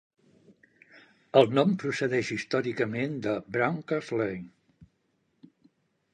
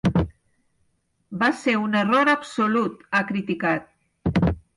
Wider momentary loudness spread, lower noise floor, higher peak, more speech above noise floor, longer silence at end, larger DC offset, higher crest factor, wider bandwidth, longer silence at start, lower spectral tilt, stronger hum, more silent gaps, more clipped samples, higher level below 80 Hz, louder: about the same, 9 LU vs 9 LU; first, -74 dBFS vs -68 dBFS; about the same, -6 dBFS vs -8 dBFS; about the same, 46 dB vs 46 dB; first, 1.65 s vs 0.2 s; neither; first, 24 dB vs 14 dB; second, 9.8 kHz vs 11.5 kHz; first, 0.95 s vs 0.05 s; about the same, -6 dB/octave vs -6.5 dB/octave; neither; neither; neither; second, -68 dBFS vs -42 dBFS; second, -28 LUFS vs -23 LUFS